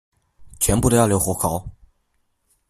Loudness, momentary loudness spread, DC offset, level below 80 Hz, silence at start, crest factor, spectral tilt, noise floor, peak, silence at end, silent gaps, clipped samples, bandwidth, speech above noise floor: -19 LUFS; 7 LU; under 0.1%; -38 dBFS; 0.4 s; 20 dB; -5 dB/octave; -68 dBFS; -2 dBFS; 0.95 s; none; under 0.1%; 15.5 kHz; 50 dB